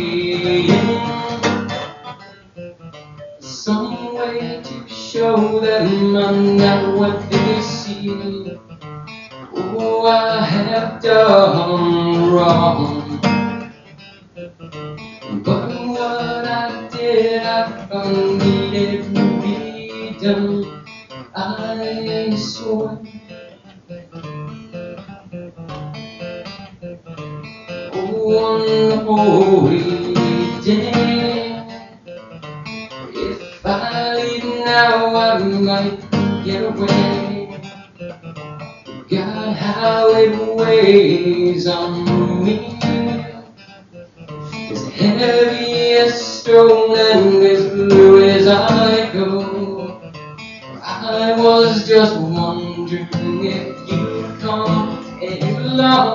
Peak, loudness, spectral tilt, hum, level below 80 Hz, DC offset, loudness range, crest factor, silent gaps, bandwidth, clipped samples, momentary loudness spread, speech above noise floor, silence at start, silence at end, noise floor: 0 dBFS; -15 LUFS; -4.5 dB/octave; none; -52 dBFS; under 0.1%; 12 LU; 16 dB; none; 7.4 kHz; under 0.1%; 21 LU; 29 dB; 0 s; 0 s; -42 dBFS